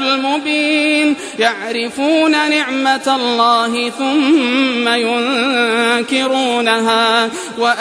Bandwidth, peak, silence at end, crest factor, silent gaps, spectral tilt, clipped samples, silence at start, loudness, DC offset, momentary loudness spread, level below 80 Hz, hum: 11 kHz; -2 dBFS; 0 s; 14 dB; none; -2.5 dB/octave; under 0.1%; 0 s; -14 LUFS; under 0.1%; 4 LU; -64 dBFS; none